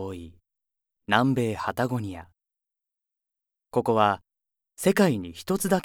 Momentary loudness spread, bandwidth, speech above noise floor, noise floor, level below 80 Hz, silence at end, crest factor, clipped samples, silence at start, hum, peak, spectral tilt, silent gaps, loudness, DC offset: 15 LU; 19.5 kHz; 60 dB; -84 dBFS; -62 dBFS; 0 s; 24 dB; under 0.1%; 0 s; none; -4 dBFS; -5.5 dB/octave; none; -25 LUFS; under 0.1%